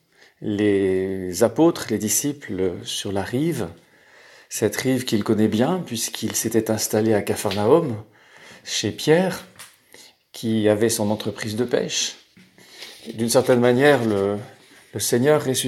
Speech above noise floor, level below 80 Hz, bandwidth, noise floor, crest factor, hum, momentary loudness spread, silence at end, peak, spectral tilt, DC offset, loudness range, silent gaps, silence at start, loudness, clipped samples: 30 dB; -62 dBFS; 16.5 kHz; -51 dBFS; 20 dB; none; 13 LU; 0 s; -2 dBFS; -4.5 dB/octave; under 0.1%; 3 LU; none; 0.4 s; -21 LUFS; under 0.1%